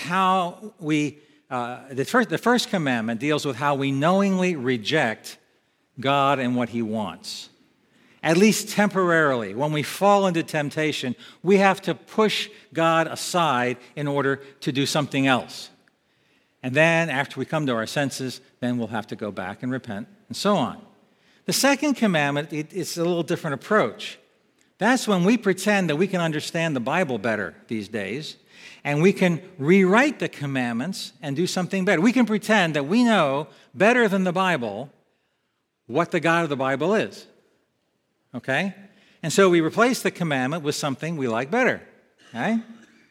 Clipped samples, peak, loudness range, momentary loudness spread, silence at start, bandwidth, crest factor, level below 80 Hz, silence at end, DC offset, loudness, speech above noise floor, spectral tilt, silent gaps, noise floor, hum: under 0.1%; -2 dBFS; 5 LU; 13 LU; 0 s; 16.5 kHz; 22 dB; -74 dBFS; 0.35 s; under 0.1%; -23 LUFS; 52 dB; -5 dB/octave; none; -74 dBFS; none